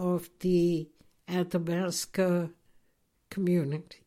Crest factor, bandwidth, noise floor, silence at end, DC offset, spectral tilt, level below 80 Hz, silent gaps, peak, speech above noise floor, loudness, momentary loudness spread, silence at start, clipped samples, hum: 14 dB; 15.5 kHz; -72 dBFS; 0.15 s; under 0.1%; -6 dB/octave; -60 dBFS; none; -16 dBFS; 42 dB; -30 LUFS; 9 LU; 0 s; under 0.1%; none